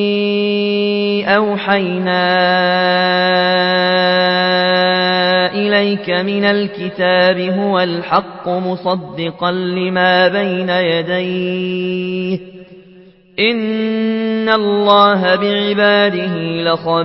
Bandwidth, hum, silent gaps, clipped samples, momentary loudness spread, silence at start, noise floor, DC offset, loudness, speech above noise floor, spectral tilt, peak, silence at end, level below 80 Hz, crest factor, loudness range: 5.8 kHz; none; none; under 0.1%; 8 LU; 0 s; -43 dBFS; under 0.1%; -14 LUFS; 29 dB; -9 dB/octave; 0 dBFS; 0 s; -60 dBFS; 14 dB; 5 LU